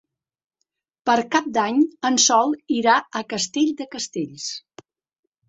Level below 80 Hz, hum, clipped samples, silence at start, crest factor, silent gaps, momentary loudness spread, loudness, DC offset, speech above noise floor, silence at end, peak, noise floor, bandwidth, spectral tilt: -68 dBFS; none; under 0.1%; 1.05 s; 20 dB; none; 13 LU; -21 LUFS; under 0.1%; 60 dB; 0.9 s; -2 dBFS; -81 dBFS; 8 kHz; -2 dB/octave